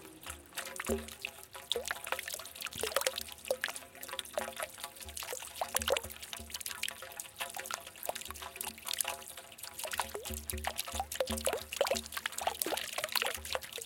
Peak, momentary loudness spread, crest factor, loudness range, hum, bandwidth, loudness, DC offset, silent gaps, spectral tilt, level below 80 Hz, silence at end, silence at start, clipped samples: -6 dBFS; 10 LU; 32 dB; 4 LU; none; 17 kHz; -38 LUFS; under 0.1%; none; -1.5 dB/octave; -58 dBFS; 0 s; 0 s; under 0.1%